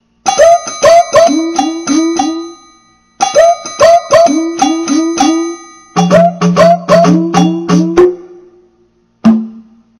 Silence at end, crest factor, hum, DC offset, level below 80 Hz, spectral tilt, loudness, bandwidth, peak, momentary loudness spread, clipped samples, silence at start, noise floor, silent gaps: 0.4 s; 10 dB; none; under 0.1%; -44 dBFS; -5 dB/octave; -9 LUFS; 13 kHz; 0 dBFS; 9 LU; 2%; 0.25 s; -52 dBFS; none